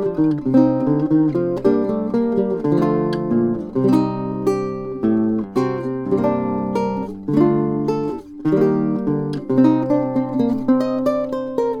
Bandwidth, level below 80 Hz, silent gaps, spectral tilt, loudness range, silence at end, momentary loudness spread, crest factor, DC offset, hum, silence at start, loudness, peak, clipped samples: 10 kHz; -50 dBFS; none; -9 dB/octave; 2 LU; 0 s; 6 LU; 16 dB; under 0.1%; none; 0 s; -19 LUFS; -2 dBFS; under 0.1%